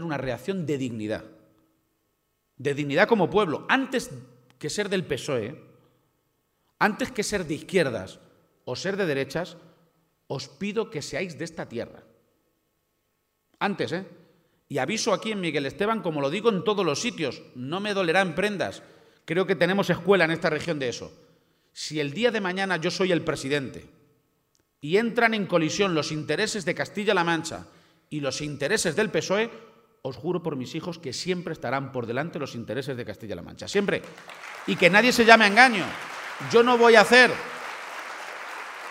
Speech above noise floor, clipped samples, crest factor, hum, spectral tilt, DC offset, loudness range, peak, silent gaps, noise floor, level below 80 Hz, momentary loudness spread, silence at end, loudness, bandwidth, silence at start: 50 dB; under 0.1%; 26 dB; none; -4 dB/octave; under 0.1%; 12 LU; 0 dBFS; none; -74 dBFS; -62 dBFS; 17 LU; 0 s; -24 LUFS; 16 kHz; 0 s